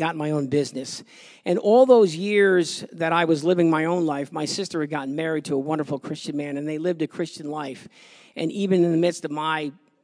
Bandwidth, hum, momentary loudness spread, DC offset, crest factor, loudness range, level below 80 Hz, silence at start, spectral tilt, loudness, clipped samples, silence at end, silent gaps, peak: 11 kHz; none; 13 LU; under 0.1%; 20 dB; 8 LU; -78 dBFS; 0 s; -5.5 dB/octave; -23 LUFS; under 0.1%; 0.35 s; none; -4 dBFS